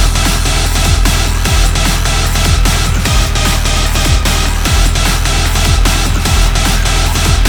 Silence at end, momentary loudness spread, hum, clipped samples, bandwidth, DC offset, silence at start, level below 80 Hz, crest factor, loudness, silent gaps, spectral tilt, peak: 0 s; 1 LU; none; under 0.1%; over 20 kHz; under 0.1%; 0 s; -12 dBFS; 10 dB; -12 LUFS; none; -3.5 dB/octave; 0 dBFS